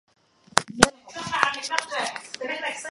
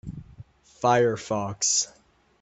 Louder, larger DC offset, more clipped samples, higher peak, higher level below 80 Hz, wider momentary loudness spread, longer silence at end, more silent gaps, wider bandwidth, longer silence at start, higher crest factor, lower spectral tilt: about the same, -25 LUFS vs -24 LUFS; neither; neither; first, 0 dBFS vs -8 dBFS; first, -50 dBFS vs -56 dBFS; second, 11 LU vs 16 LU; second, 0 s vs 0.55 s; neither; first, 16 kHz vs 8.2 kHz; first, 0.55 s vs 0.05 s; first, 26 dB vs 20 dB; about the same, -2 dB/octave vs -3 dB/octave